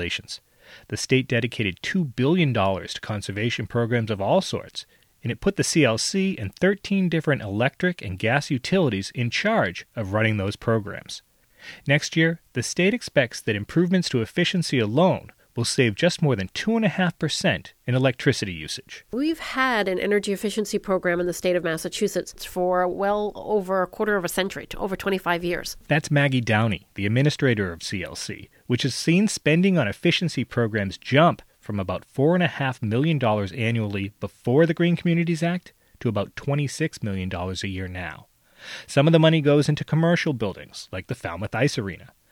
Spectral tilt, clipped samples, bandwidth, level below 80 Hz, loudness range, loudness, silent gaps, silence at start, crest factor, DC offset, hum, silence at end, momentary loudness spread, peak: -5.5 dB/octave; under 0.1%; 16.5 kHz; -54 dBFS; 3 LU; -23 LUFS; none; 0 s; 20 dB; under 0.1%; none; 0.25 s; 11 LU; -4 dBFS